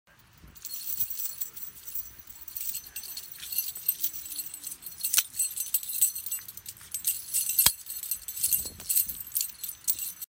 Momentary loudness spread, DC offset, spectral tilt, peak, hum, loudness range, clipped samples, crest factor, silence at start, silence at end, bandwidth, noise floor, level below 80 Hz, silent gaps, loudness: 13 LU; under 0.1%; 1.5 dB/octave; -2 dBFS; none; 6 LU; under 0.1%; 30 dB; 0.45 s; 0.05 s; 17 kHz; -55 dBFS; -62 dBFS; none; -29 LUFS